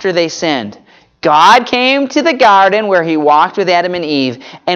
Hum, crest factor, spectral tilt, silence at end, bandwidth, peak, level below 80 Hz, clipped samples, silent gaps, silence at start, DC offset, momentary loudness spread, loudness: none; 12 dB; -4 dB/octave; 0 s; 15 kHz; 0 dBFS; -58 dBFS; under 0.1%; none; 0 s; under 0.1%; 11 LU; -10 LUFS